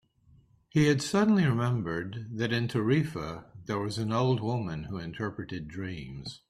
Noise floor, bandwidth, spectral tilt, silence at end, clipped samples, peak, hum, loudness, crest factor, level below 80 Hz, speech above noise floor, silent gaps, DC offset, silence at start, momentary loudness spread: -62 dBFS; 13.5 kHz; -6.5 dB/octave; 0.1 s; under 0.1%; -12 dBFS; none; -30 LUFS; 16 dB; -58 dBFS; 33 dB; none; under 0.1%; 0.75 s; 13 LU